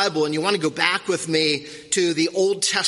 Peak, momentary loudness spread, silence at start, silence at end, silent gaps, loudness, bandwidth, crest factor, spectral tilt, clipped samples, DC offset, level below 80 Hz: 0 dBFS; 3 LU; 0 s; 0 s; none; -21 LUFS; 11.5 kHz; 22 dB; -2.5 dB/octave; under 0.1%; under 0.1%; -66 dBFS